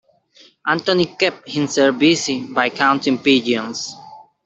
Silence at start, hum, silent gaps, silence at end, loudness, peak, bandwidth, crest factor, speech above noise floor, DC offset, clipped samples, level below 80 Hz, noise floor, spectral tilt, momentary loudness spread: 0.65 s; none; none; 0.25 s; -18 LUFS; -2 dBFS; 8.2 kHz; 18 dB; 34 dB; under 0.1%; under 0.1%; -62 dBFS; -51 dBFS; -4 dB/octave; 11 LU